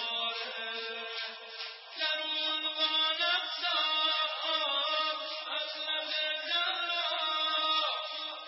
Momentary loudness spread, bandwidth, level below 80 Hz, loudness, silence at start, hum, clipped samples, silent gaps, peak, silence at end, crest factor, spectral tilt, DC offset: 9 LU; 6 kHz; under -90 dBFS; -30 LUFS; 0 s; none; under 0.1%; none; -18 dBFS; 0 s; 16 dB; -1.5 dB/octave; under 0.1%